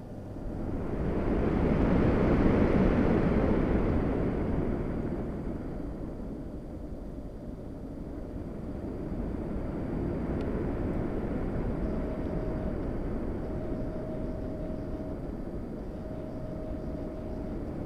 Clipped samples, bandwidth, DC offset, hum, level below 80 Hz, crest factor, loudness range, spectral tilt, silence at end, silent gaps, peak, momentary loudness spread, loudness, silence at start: under 0.1%; 9.6 kHz; under 0.1%; none; -36 dBFS; 20 dB; 12 LU; -9.5 dB/octave; 0 s; none; -12 dBFS; 15 LU; -32 LUFS; 0 s